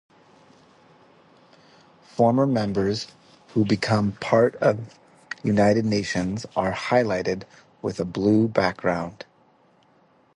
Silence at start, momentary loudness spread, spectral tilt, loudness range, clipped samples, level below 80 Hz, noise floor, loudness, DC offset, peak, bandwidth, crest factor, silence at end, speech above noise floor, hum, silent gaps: 2.15 s; 13 LU; -6.5 dB/octave; 4 LU; under 0.1%; -54 dBFS; -60 dBFS; -23 LUFS; under 0.1%; -4 dBFS; 11 kHz; 20 dB; 1.2 s; 37 dB; none; none